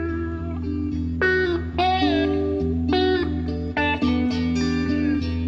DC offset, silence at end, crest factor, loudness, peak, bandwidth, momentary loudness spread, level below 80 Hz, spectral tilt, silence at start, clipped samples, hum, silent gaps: under 0.1%; 0 s; 12 dB; -23 LUFS; -10 dBFS; 7.2 kHz; 7 LU; -34 dBFS; -7 dB/octave; 0 s; under 0.1%; none; none